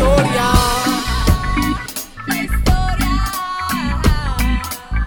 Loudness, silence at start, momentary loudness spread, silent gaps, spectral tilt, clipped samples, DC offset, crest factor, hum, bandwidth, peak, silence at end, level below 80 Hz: -18 LUFS; 0 s; 8 LU; none; -5 dB/octave; under 0.1%; under 0.1%; 16 dB; none; over 20 kHz; 0 dBFS; 0 s; -20 dBFS